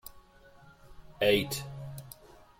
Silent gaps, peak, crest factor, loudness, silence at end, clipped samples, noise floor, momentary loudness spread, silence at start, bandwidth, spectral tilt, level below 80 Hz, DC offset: none; -12 dBFS; 22 dB; -30 LUFS; 0.15 s; under 0.1%; -57 dBFS; 24 LU; 0.05 s; 16.5 kHz; -4 dB/octave; -58 dBFS; under 0.1%